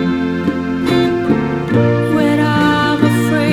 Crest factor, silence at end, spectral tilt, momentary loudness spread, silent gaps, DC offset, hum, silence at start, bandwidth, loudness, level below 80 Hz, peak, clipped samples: 14 dB; 0 s; -7 dB/octave; 5 LU; none; under 0.1%; none; 0 s; 18.5 kHz; -14 LUFS; -44 dBFS; 0 dBFS; under 0.1%